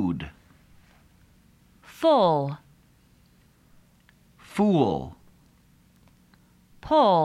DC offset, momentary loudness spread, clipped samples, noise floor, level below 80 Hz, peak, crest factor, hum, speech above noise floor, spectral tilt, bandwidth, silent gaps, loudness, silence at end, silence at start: under 0.1%; 22 LU; under 0.1%; -59 dBFS; -56 dBFS; -8 dBFS; 18 dB; none; 38 dB; -7.5 dB/octave; 15 kHz; none; -23 LUFS; 0 s; 0 s